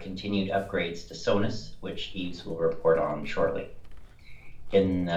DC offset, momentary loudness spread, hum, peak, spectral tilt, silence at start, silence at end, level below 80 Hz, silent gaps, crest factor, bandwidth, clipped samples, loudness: under 0.1%; 12 LU; none; -10 dBFS; -6.5 dB/octave; 0 s; 0 s; -48 dBFS; none; 18 dB; 8.4 kHz; under 0.1%; -29 LUFS